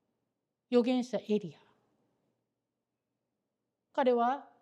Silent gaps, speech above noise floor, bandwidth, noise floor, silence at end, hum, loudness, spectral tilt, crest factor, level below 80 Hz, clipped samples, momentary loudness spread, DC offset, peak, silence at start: none; 57 dB; 9.4 kHz; -87 dBFS; 0.2 s; none; -31 LUFS; -6 dB/octave; 20 dB; under -90 dBFS; under 0.1%; 8 LU; under 0.1%; -14 dBFS; 0.7 s